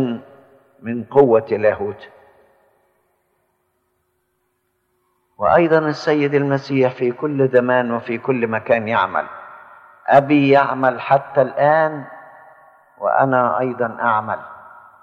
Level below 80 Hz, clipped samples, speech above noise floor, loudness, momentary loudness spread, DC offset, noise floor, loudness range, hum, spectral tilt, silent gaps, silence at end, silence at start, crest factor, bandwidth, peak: -60 dBFS; under 0.1%; 52 dB; -17 LUFS; 15 LU; under 0.1%; -69 dBFS; 5 LU; none; -8 dB/octave; none; 0.4 s; 0 s; 18 dB; 7 kHz; -2 dBFS